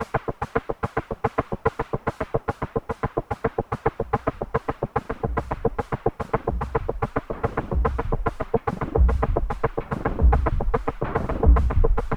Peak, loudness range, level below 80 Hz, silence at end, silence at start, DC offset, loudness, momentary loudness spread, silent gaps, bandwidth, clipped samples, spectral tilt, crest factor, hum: -6 dBFS; 4 LU; -26 dBFS; 0 s; 0 s; under 0.1%; -26 LUFS; 7 LU; none; 6.8 kHz; under 0.1%; -9 dB/octave; 18 dB; none